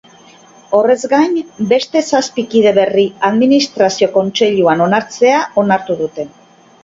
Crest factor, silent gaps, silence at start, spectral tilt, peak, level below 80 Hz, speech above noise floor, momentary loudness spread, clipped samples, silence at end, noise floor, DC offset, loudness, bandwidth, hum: 14 dB; none; 0.7 s; -4.5 dB/octave; 0 dBFS; -58 dBFS; 30 dB; 6 LU; under 0.1%; 0.55 s; -42 dBFS; under 0.1%; -13 LUFS; 7.8 kHz; none